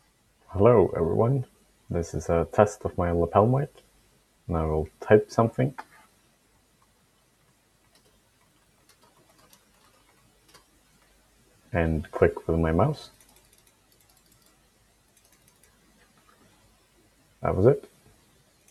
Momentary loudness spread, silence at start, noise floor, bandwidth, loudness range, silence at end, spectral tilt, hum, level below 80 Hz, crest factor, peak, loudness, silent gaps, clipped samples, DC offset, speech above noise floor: 12 LU; 0.5 s; -65 dBFS; 13.5 kHz; 10 LU; 0.9 s; -8 dB/octave; none; -46 dBFS; 26 dB; -2 dBFS; -25 LUFS; none; under 0.1%; under 0.1%; 41 dB